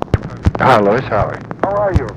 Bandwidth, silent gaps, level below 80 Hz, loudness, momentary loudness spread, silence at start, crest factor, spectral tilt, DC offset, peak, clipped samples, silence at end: 12.5 kHz; none; -26 dBFS; -15 LUFS; 9 LU; 0 s; 14 dB; -7.5 dB/octave; under 0.1%; -2 dBFS; under 0.1%; 0 s